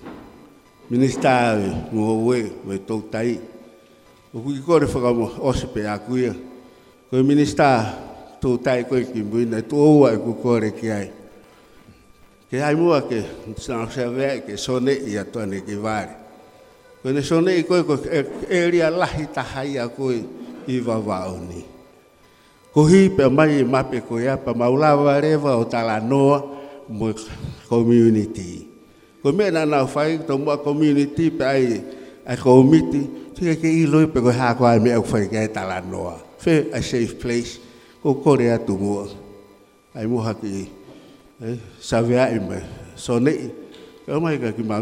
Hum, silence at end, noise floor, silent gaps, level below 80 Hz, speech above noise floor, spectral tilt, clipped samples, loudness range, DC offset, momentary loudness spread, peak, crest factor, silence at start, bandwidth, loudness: none; 0 s; -52 dBFS; none; -48 dBFS; 33 dB; -7 dB/octave; under 0.1%; 7 LU; under 0.1%; 16 LU; 0 dBFS; 20 dB; 0 s; 12.5 kHz; -20 LUFS